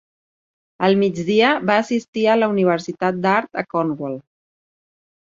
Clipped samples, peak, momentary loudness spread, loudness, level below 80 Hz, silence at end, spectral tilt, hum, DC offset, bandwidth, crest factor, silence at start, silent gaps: under 0.1%; -2 dBFS; 8 LU; -19 LUFS; -64 dBFS; 1.05 s; -6 dB/octave; none; under 0.1%; 7.6 kHz; 18 dB; 0.8 s; 2.08-2.13 s